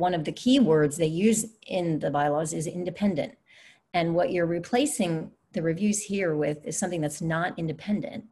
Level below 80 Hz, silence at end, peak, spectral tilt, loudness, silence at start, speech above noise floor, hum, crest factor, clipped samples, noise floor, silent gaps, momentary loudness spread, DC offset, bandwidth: -62 dBFS; 0.05 s; -10 dBFS; -5 dB/octave; -27 LUFS; 0 s; 30 dB; none; 16 dB; under 0.1%; -56 dBFS; none; 8 LU; under 0.1%; 12.5 kHz